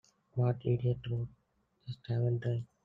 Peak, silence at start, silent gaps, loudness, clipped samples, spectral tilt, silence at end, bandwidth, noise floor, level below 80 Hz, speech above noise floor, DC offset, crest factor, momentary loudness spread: -18 dBFS; 0.35 s; none; -35 LUFS; under 0.1%; -10 dB/octave; 0.2 s; 4.8 kHz; -68 dBFS; -62 dBFS; 35 dB; under 0.1%; 16 dB; 14 LU